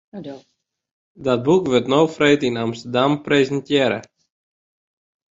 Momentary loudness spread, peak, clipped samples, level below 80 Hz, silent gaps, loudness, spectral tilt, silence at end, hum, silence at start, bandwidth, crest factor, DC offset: 12 LU; -2 dBFS; under 0.1%; -58 dBFS; 0.91-1.15 s; -19 LUFS; -5.5 dB/octave; 1.25 s; none; 0.15 s; 7.8 kHz; 18 dB; under 0.1%